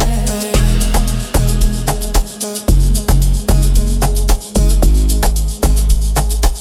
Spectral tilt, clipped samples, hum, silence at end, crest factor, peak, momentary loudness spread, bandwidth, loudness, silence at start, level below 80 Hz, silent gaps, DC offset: -5 dB/octave; under 0.1%; none; 0 s; 10 dB; -2 dBFS; 4 LU; 16 kHz; -15 LUFS; 0 s; -12 dBFS; none; under 0.1%